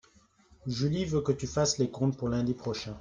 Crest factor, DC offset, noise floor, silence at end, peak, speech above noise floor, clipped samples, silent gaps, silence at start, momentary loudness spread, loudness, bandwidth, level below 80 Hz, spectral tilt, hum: 16 dB; under 0.1%; -63 dBFS; 0 s; -14 dBFS; 33 dB; under 0.1%; none; 0.65 s; 7 LU; -30 LUFS; 9.8 kHz; -54 dBFS; -5.5 dB/octave; none